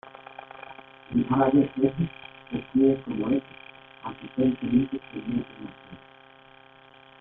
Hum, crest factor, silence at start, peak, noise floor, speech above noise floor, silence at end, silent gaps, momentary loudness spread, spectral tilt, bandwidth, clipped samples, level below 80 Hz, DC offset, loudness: none; 20 dB; 0.05 s; -8 dBFS; -53 dBFS; 27 dB; 1.25 s; none; 23 LU; -11 dB/octave; 3.9 kHz; under 0.1%; -56 dBFS; under 0.1%; -26 LUFS